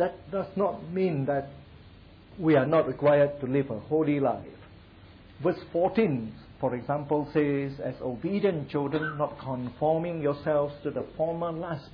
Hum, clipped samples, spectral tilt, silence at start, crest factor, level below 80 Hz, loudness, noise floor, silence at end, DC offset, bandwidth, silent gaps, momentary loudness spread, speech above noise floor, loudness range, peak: none; under 0.1%; -10.5 dB/octave; 0 s; 16 dB; -58 dBFS; -28 LUFS; -51 dBFS; 0 s; under 0.1%; 5.2 kHz; none; 10 LU; 24 dB; 3 LU; -12 dBFS